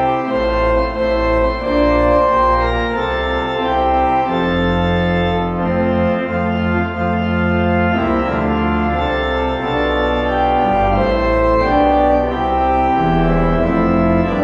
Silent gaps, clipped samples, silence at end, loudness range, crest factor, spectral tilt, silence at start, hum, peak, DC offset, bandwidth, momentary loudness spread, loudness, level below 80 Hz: none; under 0.1%; 0 s; 2 LU; 12 dB; -8 dB/octave; 0 s; none; -2 dBFS; under 0.1%; 7.4 kHz; 5 LU; -16 LUFS; -26 dBFS